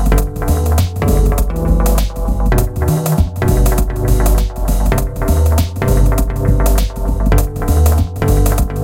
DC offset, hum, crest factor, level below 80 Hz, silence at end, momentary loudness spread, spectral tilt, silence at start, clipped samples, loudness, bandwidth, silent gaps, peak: under 0.1%; none; 12 dB; -14 dBFS; 0 s; 4 LU; -6.5 dB/octave; 0 s; under 0.1%; -15 LUFS; 17 kHz; none; 0 dBFS